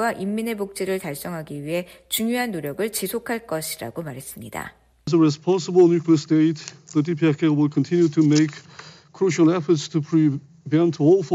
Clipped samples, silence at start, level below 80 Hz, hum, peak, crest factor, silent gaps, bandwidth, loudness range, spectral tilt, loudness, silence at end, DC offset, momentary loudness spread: under 0.1%; 0 s; -62 dBFS; none; -6 dBFS; 14 dB; none; 15.5 kHz; 7 LU; -6 dB/octave; -21 LUFS; 0 s; under 0.1%; 15 LU